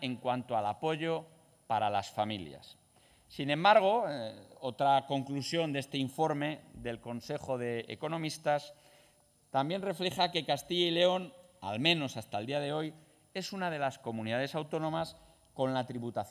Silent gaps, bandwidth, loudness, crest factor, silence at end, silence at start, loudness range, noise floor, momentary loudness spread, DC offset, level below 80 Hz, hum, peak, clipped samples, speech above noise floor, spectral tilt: none; 16 kHz; -33 LUFS; 22 dB; 0 s; 0 s; 6 LU; -67 dBFS; 13 LU; under 0.1%; -68 dBFS; none; -12 dBFS; under 0.1%; 34 dB; -5 dB/octave